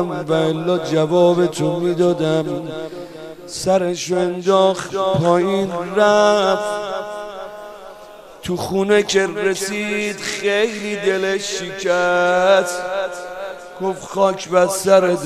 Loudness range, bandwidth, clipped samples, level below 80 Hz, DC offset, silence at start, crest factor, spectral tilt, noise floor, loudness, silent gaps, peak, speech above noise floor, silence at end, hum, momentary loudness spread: 3 LU; 13.5 kHz; under 0.1%; -54 dBFS; under 0.1%; 0 s; 16 dB; -4.5 dB/octave; -39 dBFS; -18 LUFS; none; -2 dBFS; 22 dB; 0 s; none; 16 LU